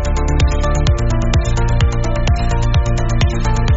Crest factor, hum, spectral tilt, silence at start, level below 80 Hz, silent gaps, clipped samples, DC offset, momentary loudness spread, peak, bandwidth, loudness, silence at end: 12 dB; none; -6 dB/octave; 0 s; -16 dBFS; none; under 0.1%; under 0.1%; 2 LU; -2 dBFS; 8 kHz; -17 LUFS; 0 s